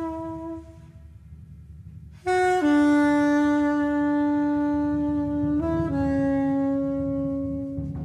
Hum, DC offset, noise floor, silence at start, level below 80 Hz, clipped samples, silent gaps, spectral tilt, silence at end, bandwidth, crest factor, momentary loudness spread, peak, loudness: none; under 0.1%; -45 dBFS; 0 s; -44 dBFS; under 0.1%; none; -7 dB/octave; 0 s; 10 kHz; 12 dB; 14 LU; -12 dBFS; -24 LUFS